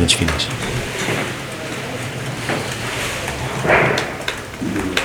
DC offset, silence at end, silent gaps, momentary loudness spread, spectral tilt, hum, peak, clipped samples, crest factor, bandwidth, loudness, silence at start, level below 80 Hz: under 0.1%; 0 s; none; 11 LU; -3.5 dB/octave; none; 0 dBFS; under 0.1%; 20 dB; over 20 kHz; -20 LUFS; 0 s; -38 dBFS